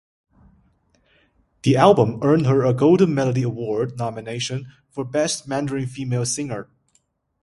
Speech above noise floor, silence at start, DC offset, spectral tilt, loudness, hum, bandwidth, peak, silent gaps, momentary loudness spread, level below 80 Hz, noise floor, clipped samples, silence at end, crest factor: 46 dB; 1.65 s; under 0.1%; -6 dB/octave; -20 LUFS; none; 11.5 kHz; 0 dBFS; none; 13 LU; -56 dBFS; -66 dBFS; under 0.1%; 0.8 s; 22 dB